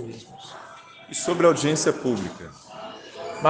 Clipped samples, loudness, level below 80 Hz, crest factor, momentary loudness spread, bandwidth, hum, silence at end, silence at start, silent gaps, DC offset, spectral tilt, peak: under 0.1%; -23 LUFS; -64 dBFS; 22 dB; 22 LU; 10 kHz; none; 0 s; 0 s; none; under 0.1%; -4.5 dB/octave; -4 dBFS